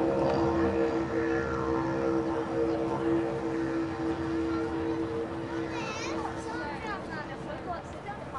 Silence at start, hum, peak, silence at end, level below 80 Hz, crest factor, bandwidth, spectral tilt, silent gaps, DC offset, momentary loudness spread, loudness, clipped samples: 0 s; none; -16 dBFS; 0 s; -52 dBFS; 16 dB; 10.5 kHz; -6.5 dB/octave; none; under 0.1%; 10 LU; -31 LUFS; under 0.1%